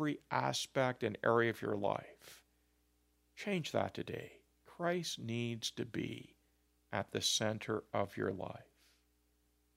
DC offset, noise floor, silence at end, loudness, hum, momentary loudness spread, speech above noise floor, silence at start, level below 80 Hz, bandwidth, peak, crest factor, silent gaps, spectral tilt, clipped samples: under 0.1%; -76 dBFS; 1.15 s; -38 LUFS; 60 Hz at -65 dBFS; 14 LU; 38 dB; 0 s; -74 dBFS; 16 kHz; -18 dBFS; 22 dB; none; -4 dB/octave; under 0.1%